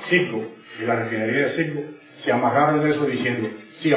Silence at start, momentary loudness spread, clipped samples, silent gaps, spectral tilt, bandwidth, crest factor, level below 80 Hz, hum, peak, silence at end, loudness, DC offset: 0 s; 13 LU; under 0.1%; none; -10 dB/octave; 4 kHz; 18 dB; -66 dBFS; none; -6 dBFS; 0 s; -22 LUFS; under 0.1%